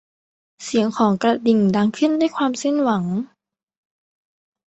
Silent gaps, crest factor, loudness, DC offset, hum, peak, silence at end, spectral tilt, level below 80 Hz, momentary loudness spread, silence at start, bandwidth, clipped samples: none; 18 dB; -19 LUFS; under 0.1%; none; -4 dBFS; 1.4 s; -6 dB/octave; -62 dBFS; 9 LU; 0.6 s; 8.2 kHz; under 0.1%